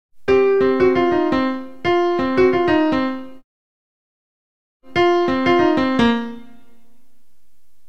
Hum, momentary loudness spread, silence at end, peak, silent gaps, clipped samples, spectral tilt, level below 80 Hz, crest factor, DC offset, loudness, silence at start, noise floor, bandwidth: none; 9 LU; 1.5 s; -4 dBFS; 3.44-4.80 s; under 0.1%; -6.5 dB/octave; -46 dBFS; 16 dB; 2%; -17 LUFS; 0.1 s; -67 dBFS; 7.2 kHz